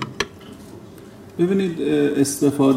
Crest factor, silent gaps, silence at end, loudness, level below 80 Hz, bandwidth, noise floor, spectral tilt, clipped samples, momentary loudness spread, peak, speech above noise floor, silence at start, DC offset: 16 dB; none; 0 s; -20 LUFS; -56 dBFS; 16 kHz; -41 dBFS; -5.5 dB/octave; under 0.1%; 22 LU; -4 dBFS; 23 dB; 0 s; under 0.1%